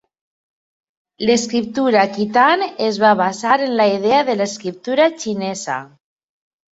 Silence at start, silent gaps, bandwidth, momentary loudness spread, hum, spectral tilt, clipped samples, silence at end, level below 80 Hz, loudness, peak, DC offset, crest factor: 1.2 s; none; 8.2 kHz; 9 LU; none; -4 dB/octave; under 0.1%; 0.9 s; -62 dBFS; -17 LUFS; -2 dBFS; under 0.1%; 16 dB